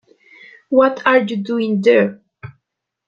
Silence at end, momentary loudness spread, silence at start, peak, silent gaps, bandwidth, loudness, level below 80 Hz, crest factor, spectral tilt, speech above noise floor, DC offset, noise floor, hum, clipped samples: 0.6 s; 8 LU; 0.7 s; -2 dBFS; none; 7.4 kHz; -16 LUFS; -64 dBFS; 16 dB; -7 dB/octave; 62 dB; under 0.1%; -77 dBFS; none; under 0.1%